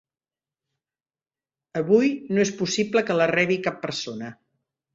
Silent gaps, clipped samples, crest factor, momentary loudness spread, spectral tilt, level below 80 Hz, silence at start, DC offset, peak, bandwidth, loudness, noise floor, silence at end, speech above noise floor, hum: none; under 0.1%; 18 dB; 13 LU; -4.5 dB/octave; -66 dBFS; 1.75 s; under 0.1%; -6 dBFS; 7.8 kHz; -23 LUFS; under -90 dBFS; 0.6 s; over 67 dB; none